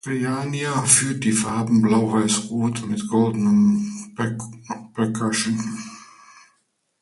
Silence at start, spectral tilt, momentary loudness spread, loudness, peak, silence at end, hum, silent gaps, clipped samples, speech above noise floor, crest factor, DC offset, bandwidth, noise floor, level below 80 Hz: 0.05 s; -4.5 dB/octave; 15 LU; -21 LUFS; -2 dBFS; 0.95 s; none; none; under 0.1%; 47 dB; 20 dB; under 0.1%; 11.5 kHz; -68 dBFS; -58 dBFS